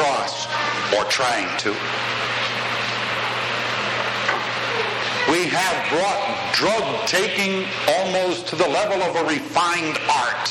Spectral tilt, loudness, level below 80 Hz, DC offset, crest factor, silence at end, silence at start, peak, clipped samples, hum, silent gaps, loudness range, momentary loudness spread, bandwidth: -2.5 dB/octave; -21 LUFS; -60 dBFS; under 0.1%; 16 dB; 0 s; 0 s; -6 dBFS; under 0.1%; none; none; 2 LU; 4 LU; 14.5 kHz